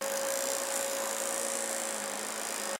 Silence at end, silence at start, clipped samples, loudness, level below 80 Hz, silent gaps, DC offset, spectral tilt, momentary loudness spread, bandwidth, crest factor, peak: 0 s; 0 s; under 0.1%; -32 LUFS; -80 dBFS; none; under 0.1%; 0 dB/octave; 3 LU; 17 kHz; 20 dB; -14 dBFS